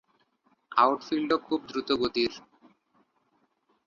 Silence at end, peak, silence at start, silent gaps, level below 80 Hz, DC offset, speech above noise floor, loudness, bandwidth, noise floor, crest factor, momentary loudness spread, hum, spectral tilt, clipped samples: 1.5 s; -8 dBFS; 0.7 s; none; -64 dBFS; under 0.1%; 45 dB; -27 LUFS; 7.2 kHz; -72 dBFS; 24 dB; 7 LU; none; -4.5 dB/octave; under 0.1%